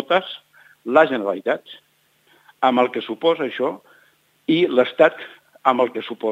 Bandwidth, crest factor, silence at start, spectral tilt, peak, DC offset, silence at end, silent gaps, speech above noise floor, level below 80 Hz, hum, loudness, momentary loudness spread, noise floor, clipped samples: 8 kHz; 20 dB; 0 s; -6 dB/octave; 0 dBFS; under 0.1%; 0 s; none; 40 dB; -74 dBFS; none; -20 LUFS; 18 LU; -59 dBFS; under 0.1%